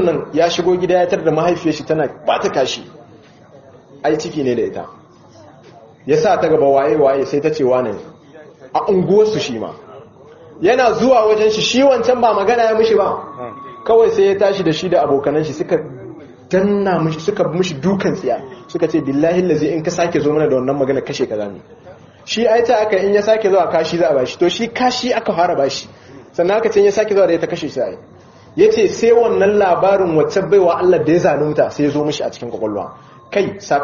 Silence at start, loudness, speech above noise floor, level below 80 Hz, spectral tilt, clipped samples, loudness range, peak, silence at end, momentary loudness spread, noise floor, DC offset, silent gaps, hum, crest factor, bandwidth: 0 s; -15 LUFS; 28 dB; -52 dBFS; -4.5 dB/octave; under 0.1%; 5 LU; 0 dBFS; 0 s; 11 LU; -43 dBFS; under 0.1%; none; none; 14 dB; 7.2 kHz